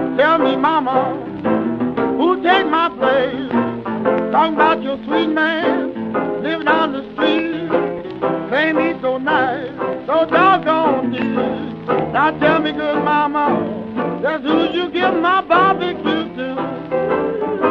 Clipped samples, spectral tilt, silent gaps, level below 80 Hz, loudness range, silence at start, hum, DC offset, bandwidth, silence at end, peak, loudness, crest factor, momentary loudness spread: under 0.1%; -7.5 dB/octave; none; -54 dBFS; 2 LU; 0 s; none; under 0.1%; 6.4 kHz; 0 s; 0 dBFS; -17 LUFS; 16 dB; 8 LU